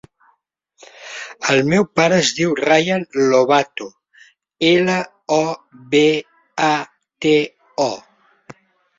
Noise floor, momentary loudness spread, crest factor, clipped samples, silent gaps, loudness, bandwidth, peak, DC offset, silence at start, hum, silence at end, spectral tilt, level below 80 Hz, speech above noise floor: -64 dBFS; 17 LU; 16 dB; under 0.1%; none; -17 LUFS; 7.8 kHz; -2 dBFS; under 0.1%; 1 s; none; 0.45 s; -4.5 dB/octave; -60 dBFS; 48 dB